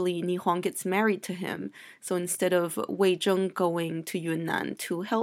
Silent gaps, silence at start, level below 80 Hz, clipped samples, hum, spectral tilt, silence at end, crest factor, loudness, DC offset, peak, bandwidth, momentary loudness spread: none; 0 s; -78 dBFS; under 0.1%; none; -4.5 dB/octave; 0 s; 16 dB; -28 LUFS; under 0.1%; -12 dBFS; 16.5 kHz; 8 LU